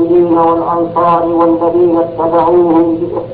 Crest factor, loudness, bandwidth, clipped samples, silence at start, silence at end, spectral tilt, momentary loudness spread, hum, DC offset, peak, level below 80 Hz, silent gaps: 8 dB; -10 LUFS; 4.4 kHz; under 0.1%; 0 s; 0 s; -12 dB/octave; 4 LU; none; under 0.1%; -2 dBFS; -42 dBFS; none